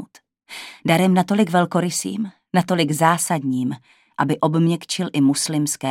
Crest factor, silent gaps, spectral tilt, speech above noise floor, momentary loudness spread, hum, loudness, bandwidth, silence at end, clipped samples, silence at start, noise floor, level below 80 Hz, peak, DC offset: 20 dB; none; -5 dB/octave; 27 dB; 11 LU; none; -20 LUFS; 16.5 kHz; 0 s; under 0.1%; 0 s; -46 dBFS; -68 dBFS; 0 dBFS; under 0.1%